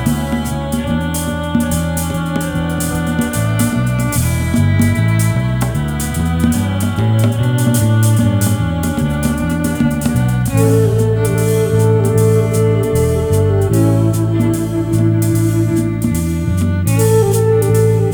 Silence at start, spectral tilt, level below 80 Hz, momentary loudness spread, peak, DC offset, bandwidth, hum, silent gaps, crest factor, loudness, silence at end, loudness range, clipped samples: 0 s; -6.5 dB/octave; -30 dBFS; 5 LU; 0 dBFS; under 0.1%; over 20 kHz; none; none; 12 dB; -15 LUFS; 0 s; 3 LU; under 0.1%